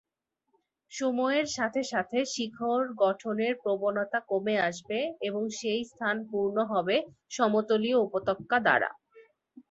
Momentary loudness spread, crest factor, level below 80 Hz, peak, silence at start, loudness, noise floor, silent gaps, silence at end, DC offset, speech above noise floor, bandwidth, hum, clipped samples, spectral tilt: 7 LU; 20 dB; -72 dBFS; -10 dBFS; 0.9 s; -29 LUFS; -82 dBFS; none; 0.1 s; under 0.1%; 53 dB; 8.2 kHz; none; under 0.1%; -4 dB/octave